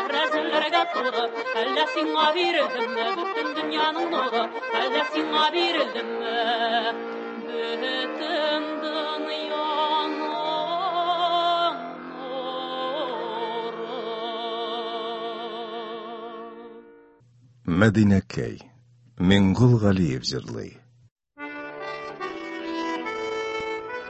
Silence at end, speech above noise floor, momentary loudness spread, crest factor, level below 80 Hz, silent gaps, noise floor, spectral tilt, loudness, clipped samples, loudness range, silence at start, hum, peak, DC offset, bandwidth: 0 s; 33 dB; 14 LU; 22 dB; -50 dBFS; 21.11-21.16 s; -56 dBFS; -6 dB/octave; -25 LUFS; under 0.1%; 9 LU; 0 s; none; -4 dBFS; under 0.1%; 8.4 kHz